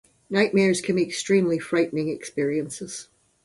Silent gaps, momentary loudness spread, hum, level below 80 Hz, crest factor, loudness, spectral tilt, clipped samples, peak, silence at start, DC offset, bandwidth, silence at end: none; 12 LU; none; -64 dBFS; 18 dB; -24 LUFS; -5 dB/octave; under 0.1%; -8 dBFS; 0.3 s; under 0.1%; 11.5 kHz; 0.4 s